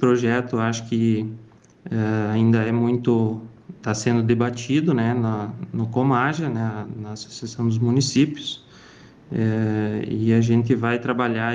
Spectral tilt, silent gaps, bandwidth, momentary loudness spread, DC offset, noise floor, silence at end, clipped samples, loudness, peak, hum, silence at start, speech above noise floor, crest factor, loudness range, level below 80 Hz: -6.5 dB/octave; none; 9.4 kHz; 13 LU; under 0.1%; -47 dBFS; 0 s; under 0.1%; -22 LUFS; -6 dBFS; none; 0 s; 26 dB; 16 dB; 3 LU; -60 dBFS